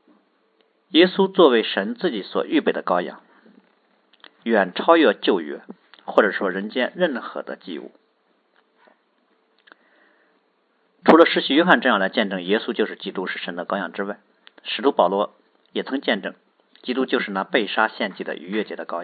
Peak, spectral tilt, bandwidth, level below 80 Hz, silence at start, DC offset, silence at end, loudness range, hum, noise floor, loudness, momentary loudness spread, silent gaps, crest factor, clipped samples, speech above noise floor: 0 dBFS; -7.5 dB/octave; 5.6 kHz; -76 dBFS; 0.95 s; under 0.1%; 0 s; 6 LU; none; -65 dBFS; -21 LUFS; 16 LU; none; 22 dB; under 0.1%; 45 dB